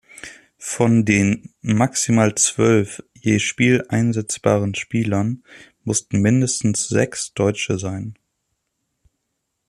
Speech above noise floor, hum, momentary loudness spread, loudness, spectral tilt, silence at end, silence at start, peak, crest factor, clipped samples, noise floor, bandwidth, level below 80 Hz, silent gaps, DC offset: 57 dB; none; 13 LU; -19 LUFS; -5 dB/octave; 1.55 s; 0.15 s; -2 dBFS; 18 dB; under 0.1%; -75 dBFS; 13.5 kHz; -54 dBFS; none; under 0.1%